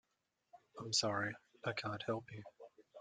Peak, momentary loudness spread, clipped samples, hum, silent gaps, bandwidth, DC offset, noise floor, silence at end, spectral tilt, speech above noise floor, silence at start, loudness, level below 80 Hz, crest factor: -20 dBFS; 22 LU; under 0.1%; none; none; 9.6 kHz; under 0.1%; -86 dBFS; 0 s; -3 dB/octave; 45 dB; 0.55 s; -40 LUFS; -80 dBFS; 22 dB